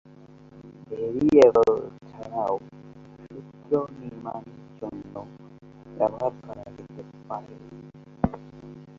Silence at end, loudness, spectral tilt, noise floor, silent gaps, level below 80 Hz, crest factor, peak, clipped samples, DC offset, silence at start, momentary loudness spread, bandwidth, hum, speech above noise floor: 0.15 s; -24 LUFS; -7.5 dB/octave; -49 dBFS; none; -54 dBFS; 24 dB; -4 dBFS; under 0.1%; under 0.1%; 0.55 s; 26 LU; 7.4 kHz; none; 27 dB